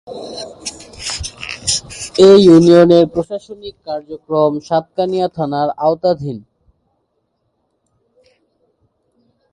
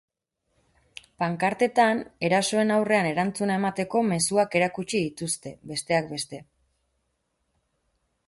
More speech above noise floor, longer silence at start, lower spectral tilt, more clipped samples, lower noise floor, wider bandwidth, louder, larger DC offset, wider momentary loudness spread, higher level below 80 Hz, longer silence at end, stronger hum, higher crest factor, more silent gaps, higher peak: first, 55 dB vs 51 dB; second, 0.1 s vs 1.2 s; about the same, -5.5 dB/octave vs -4.5 dB/octave; neither; second, -67 dBFS vs -76 dBFS; about the same, 11.5 kHz vs 12 kHz; first, -13 LUFS vs -25 LUFS; neither; first, 21 LU vs 10 LU; first, -46 dBFS vs -66 dBFS; first, 3.15 s vs 1.85 s; neither; about the same, 16 dB vs 20 dB; neither; first, 0 dBFS vs -8 dBFS